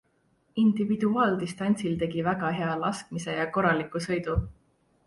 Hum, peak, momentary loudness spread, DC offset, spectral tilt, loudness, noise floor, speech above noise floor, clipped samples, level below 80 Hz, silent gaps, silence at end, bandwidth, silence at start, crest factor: none; -12 dBFS; 7 LU; under 0.1%; -6.5 dB/octave; -27 LUFS; -68 dBFS; 42 dB; under 0.1%; -46 dBFS; none; 0.55 s; 11.5 kHz; 0.55 s; 16 dB